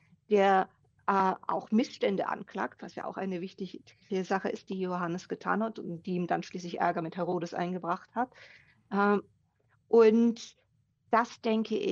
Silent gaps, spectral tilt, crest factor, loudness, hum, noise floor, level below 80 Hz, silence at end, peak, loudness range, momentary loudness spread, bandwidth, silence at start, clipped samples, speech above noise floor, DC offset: none; -6.5 dB/octave; 20 dB; -30 LUFS; none; -71 dBFS; -78 dBFS; 0 s; -10 dBFS; 6 LU; 13 LU; 7.4 kHz; 0.3 s; under 0.1%; 41 dB; under 0.1%